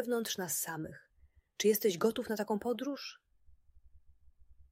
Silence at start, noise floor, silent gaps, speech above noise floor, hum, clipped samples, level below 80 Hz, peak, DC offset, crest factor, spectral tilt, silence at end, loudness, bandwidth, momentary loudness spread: 0 s; -67 dBFS; none; 33 dB; none; under 0.1%; -68 dBFS; -18 dBFS; under 0.1%; 20 dB; -3.5 dB/octave; 0.1 s; -34 LUFS; 16 kHz; 14 LU